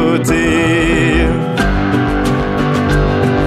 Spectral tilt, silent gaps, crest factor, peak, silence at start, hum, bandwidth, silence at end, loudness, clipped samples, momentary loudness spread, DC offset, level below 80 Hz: -6 dB/octave; none; 12 dB; -2 dBFS; 0 s; none; 15 kHz; 0 s; -13 LUFS; under 0.1%; 3 LU; under 0.1%; -22 dBFS